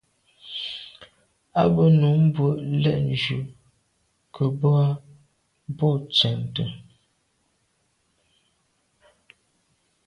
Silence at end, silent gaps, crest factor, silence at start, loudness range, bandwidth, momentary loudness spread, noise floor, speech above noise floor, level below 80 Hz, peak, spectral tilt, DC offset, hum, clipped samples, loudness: 3.25 s; none; 18 dB; 0.45 s; 6 LU; 6.8 kHz; 19 LU; -69 dBFS; 49 dB; -56 dBFS; -6 dBFS; -8 dB/octave; under 0.1%; none; under 0.1%; -22 LUFS